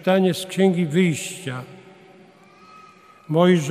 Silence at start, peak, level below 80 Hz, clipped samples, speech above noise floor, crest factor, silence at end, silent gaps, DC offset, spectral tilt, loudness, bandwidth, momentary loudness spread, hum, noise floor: 0 s; -4 dBFS; -68 dBFS; under 0.1%; 30 dB; 18 dB; 0 s; none; under 0.1%; -6 dB/octave; -21 LUFS; 15 kHz; 15 LU; none; -49 dBFS